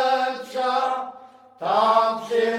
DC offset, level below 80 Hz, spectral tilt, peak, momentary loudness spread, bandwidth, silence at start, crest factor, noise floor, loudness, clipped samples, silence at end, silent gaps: under 0.1%; -78 dBFS; -3.5 dB/octave; -6 dBFS; 12 LU; 15.5 kHz; 0 s; 16 dB; -46 dBFS; -22 LUFS; under 0.1%; 0 s; none